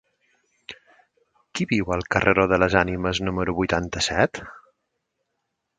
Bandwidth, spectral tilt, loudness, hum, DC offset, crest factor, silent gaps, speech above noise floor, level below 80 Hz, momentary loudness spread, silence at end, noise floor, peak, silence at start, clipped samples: 9.4 kHz; -5 dB/octave; -22 LUFS; none; under 0.1%; 24 dB; none; 56 dB; -44 dBFS; 21 LU; 1.2 s; -78 dBFS; 0 dBFS; 0.7 s; under 0.1%